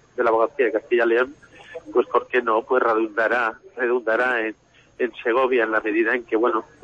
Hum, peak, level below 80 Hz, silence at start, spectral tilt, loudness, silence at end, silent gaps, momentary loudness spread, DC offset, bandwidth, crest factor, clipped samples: none; -6 dBFS; -64 dBFS; 0.15 s; -5.5 dB/octave; -21 LUFS; 0.2 s; none; 7 LU; under 0.1%; 7 kHz; 16 dB; under 0.1%